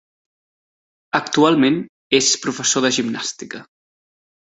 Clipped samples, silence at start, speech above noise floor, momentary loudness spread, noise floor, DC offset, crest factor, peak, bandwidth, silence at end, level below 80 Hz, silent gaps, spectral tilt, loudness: under 0.1%; 1.15 s; over 72 dB; 14 LU; under -90 dBFS; under 0.1%; 20 dB; 0 dBFS; 8.4 kHz; 0.95 s; -64 dBFS; 1.89-2.10 s; -2.5 dB/octave; -18 LUFS